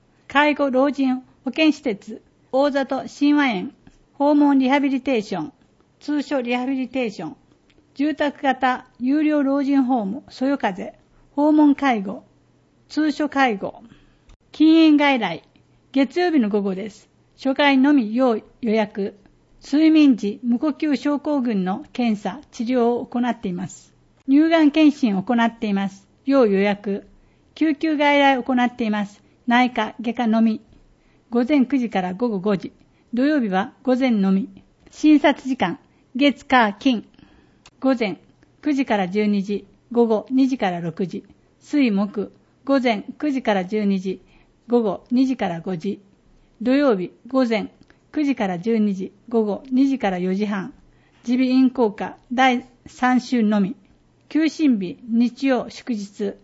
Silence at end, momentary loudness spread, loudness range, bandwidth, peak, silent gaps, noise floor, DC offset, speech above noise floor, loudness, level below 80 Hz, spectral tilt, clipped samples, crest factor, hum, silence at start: 0.1 s; 13 LU; 4 LU; 8 kHz; -2 dBFS; 14.36-14.40 s; -58 dBFS; under 0.1%; 38 dB; -20 LUFS; -60 dBFS; -6.5 dB/octave; under 0.1%; 18 dB; none; 0.3 s